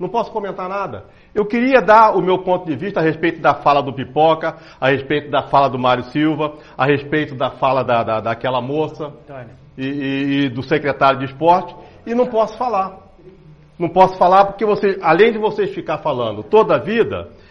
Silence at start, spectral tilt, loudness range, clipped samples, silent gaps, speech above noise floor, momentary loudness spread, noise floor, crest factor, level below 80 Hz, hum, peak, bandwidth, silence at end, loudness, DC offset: 0 s; -7.5 dB/octave; 5 LU; under 0.1%; none; 27 dB; 12 LU; -44 dBFS; 16 dB; -50 dBFS; none; 0 dBFS; 6.8 kHz; 0.25 s; -17 LUFS; under 0.1%